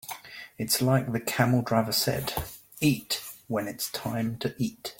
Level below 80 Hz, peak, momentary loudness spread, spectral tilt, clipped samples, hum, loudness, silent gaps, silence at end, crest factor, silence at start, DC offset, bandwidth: -54 dBFS; -6 dBFS; 12 LU; -4.5 dB/octave; under 0.1%; none; -28 LUFS; none; 0.05 s; 22 dB; 0.05 s; under 0.1%; 17 kHz